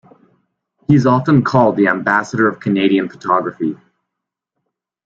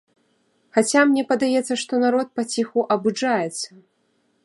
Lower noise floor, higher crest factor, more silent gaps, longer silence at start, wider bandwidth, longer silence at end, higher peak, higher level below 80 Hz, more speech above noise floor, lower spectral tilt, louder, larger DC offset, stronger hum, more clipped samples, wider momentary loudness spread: first, -81 dBFS vs -67 dBFS; about the same, 16 dB vs 18 dB; neither; first, 0.9 s vs 0.75 s; second, 7.8 kHz vs 11.5 kHz; first, 1.3 s vs 0.8 s; first, 0 dBFS vs -4 dBFS; first, -54 dBFS vs -74 dBFS; first, 66 dB vs 46 dB; first, -7.5 dB/octave vs -3.5 dB/octave; first, -15 LUFS vs -21 LUFS; neither; neither; neither; first, 11 LU vs 8 LU